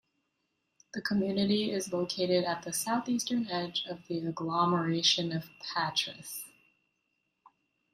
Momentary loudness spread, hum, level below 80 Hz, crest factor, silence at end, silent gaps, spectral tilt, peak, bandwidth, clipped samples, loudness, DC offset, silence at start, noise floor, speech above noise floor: 11 LU; none; -72 dBFS; 20 dB; 1.45 s; none; -4 dB/octave; -14 dBFS; 15.5 kHz; under 0.1%; -31 LUFS; under 0.1%; 0.95 s; -80 dBFS; 49 dB